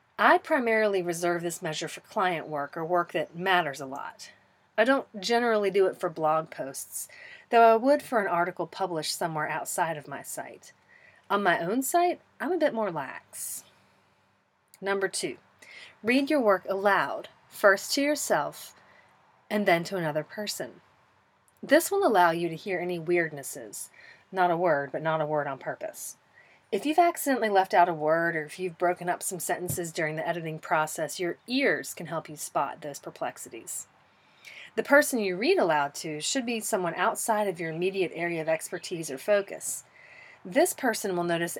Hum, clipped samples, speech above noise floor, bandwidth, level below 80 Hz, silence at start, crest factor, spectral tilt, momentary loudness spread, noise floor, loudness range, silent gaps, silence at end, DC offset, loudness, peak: none; under 0.1%; 41 dB; 18.5 kHz; -76 dBFS; 0.2 s; 22 dB; -3.5 dB/octave; 14 LU; -68 dBFS; 5 LU; none; 0 s; under 0.1%; -27 LUFS; -6 dBFS